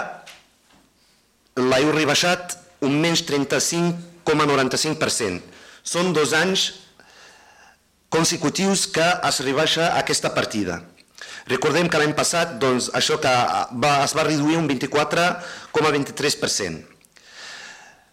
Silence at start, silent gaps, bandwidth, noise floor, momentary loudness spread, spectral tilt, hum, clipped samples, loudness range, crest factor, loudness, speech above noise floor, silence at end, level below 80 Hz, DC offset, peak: 0 s; none; 16.5 kHz; -60 dBFS; 15 LU; -3.5 dB/octave; none; under 0.1%; 3 LU; 16 dB; -20 LUFS; 40 dB; 0.3 s; -58 dBFS; under 0.1%; -6 dBFS